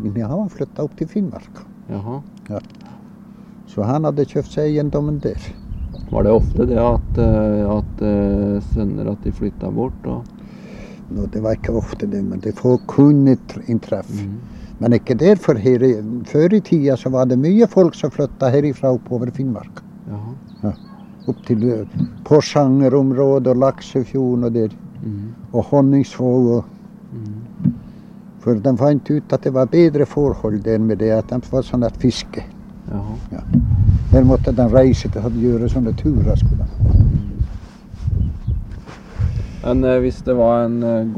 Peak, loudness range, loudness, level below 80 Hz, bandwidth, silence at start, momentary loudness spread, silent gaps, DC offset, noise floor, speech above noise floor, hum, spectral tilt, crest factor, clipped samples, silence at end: 0 dBFS; 7 LU; -17 LUFS; -28 dBFS; 9.2 kHz; 0 s; 17 LU; none; under 0.1%; -39 dBFS; 23 dB; none; -9 dB/octave; 18 dB; under 0.1%; 0 s